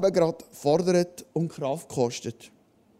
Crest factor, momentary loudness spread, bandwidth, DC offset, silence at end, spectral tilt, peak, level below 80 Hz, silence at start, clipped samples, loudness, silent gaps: 18 dB; 9 LU; 15.5 kHz; under 0.1%; 0.5 s; -6 dB/octave; -10 dBFS; -66 dBFS; 0 s; under 0.1%; -27 LUFS; none